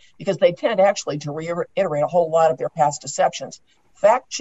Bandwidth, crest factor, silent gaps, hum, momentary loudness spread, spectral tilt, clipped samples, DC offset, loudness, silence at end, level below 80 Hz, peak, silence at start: 8.2 kHz; 16 dB; none; none; 9 LU; -4.5 dB/octave; under 0.1%; 0.1%; -20 LUFS; 0 s; -66 dBFS; -4 dBFS; 0.2 s